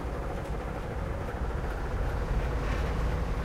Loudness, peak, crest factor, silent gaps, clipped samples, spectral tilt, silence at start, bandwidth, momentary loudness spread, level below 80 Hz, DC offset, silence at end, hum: -34 LUFS; -18 dBFS; 14 dB; none; under 0.1%; -7 dB/octave; 0 s; 14 kHz; 4 LU; -34 dBFS; under 0.1%; 0 s; none